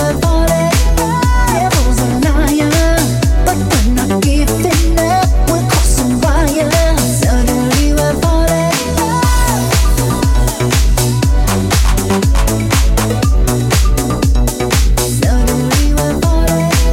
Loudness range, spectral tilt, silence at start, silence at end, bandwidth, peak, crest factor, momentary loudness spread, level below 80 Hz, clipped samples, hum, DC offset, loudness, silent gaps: 1 LU; -5 dB/octave; 0 s; 0 s; 17 kHz; 0 dBFS; 10 dB; 2 LU; -14 dBFS; under 0.1%; none; under 0.1%; -13 LUFS; none